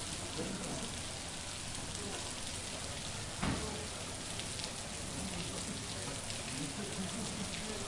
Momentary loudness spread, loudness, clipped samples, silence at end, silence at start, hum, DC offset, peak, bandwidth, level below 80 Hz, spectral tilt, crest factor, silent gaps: 2 LU; -40 LUFS; under 0.1%; 0 s; 0 s; none; under 0.1%; -22 dBFS; 11.5 kHz; -54 dBFS; -3 dB/octave; 20 dB; none